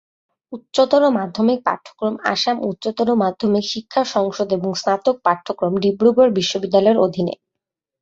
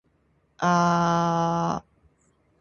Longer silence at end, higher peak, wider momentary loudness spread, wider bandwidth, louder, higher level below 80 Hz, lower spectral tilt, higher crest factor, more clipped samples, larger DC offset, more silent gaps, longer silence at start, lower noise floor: second, 0.65 s vs 0.8 s; first, -2 dBFS vs -8 dBFS; about the same, 9 LU vs 8 LU; first, 7.8 kHz vs 7 kHz; first, -18 LUFS vs -24 LUFS; about the same, -60 dBFS vs -56 dBFS; about the same, -5.5 dB/octave vs -6 dB/octave; about the same, 16 dB vs 18 dB; neither; neither; neither; about the same, 0.5 s vs 0.6 s; first, -83 dBFS vs -66 dBFS